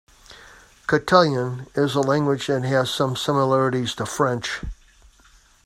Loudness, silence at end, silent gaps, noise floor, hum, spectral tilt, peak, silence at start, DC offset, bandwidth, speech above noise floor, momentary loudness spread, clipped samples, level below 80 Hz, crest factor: -21 LUFS; 0.9 s; none; -54 dBFS; none; -5.5 dB/octave; 0 dBFS; 0.3 s; under 0.1%; 15.5 kHz; 33 dB; 10 LU; under 0.1%; -46 dBFS; 22 dB